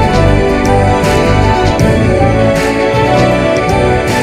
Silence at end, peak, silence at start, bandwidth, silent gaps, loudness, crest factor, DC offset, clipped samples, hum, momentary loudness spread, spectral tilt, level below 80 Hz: 0 s; 0 dBFS; 0 s; 15 kHz; none; -10 LUFS; 10 dB; under 0.1%; under 0.1%; none; 2 LU; -6 dB/octave; -20 dBFS